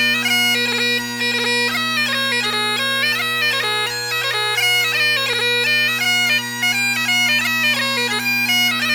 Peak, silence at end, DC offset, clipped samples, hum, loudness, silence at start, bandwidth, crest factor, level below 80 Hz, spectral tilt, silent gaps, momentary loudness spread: -6 dBFS; 0 s; under 0.1%; under 0.1%; none; -16 LUFS; 0 s; over 20 kHz; 12 dB; -62 dBFS; -1 dB/octave; none; 3 LU